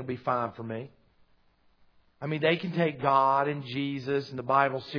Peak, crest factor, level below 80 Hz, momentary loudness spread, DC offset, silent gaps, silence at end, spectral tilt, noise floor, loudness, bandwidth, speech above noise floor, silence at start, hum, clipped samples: -10 dBFS; 20 dB; -70 dBFS; 14 LU; under 0.1%; none; 0 s; -7.5 dB/octave; -65 dBFS; -28 LUFS; 5.4 kHz; 36 dB; 0 s; none; under 0.1%